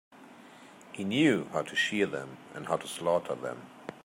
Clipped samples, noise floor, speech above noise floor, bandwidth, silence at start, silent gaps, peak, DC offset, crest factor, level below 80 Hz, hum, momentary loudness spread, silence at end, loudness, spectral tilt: under 0.1%; -52 dBFS; 22 dB; 16 kHz; 0.15 s; none; -12 dBFS; under 0.1%; 22 dB; -74 dBFS; none; 18 LU; 0.05 s; -30 LUFS; -4.5 dB/octave